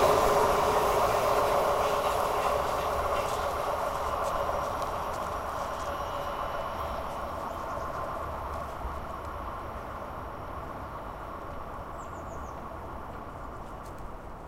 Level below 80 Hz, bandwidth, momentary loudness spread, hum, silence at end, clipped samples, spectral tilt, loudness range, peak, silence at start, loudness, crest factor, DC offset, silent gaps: -44 dBFS; 16 kHz; 15 LU; none; 0 s; under 0.1%; -4.5 dB/octave; 13 LU; -10 dBFS; 0 s; -31 LUFS; 20 dB; under 0.1%; none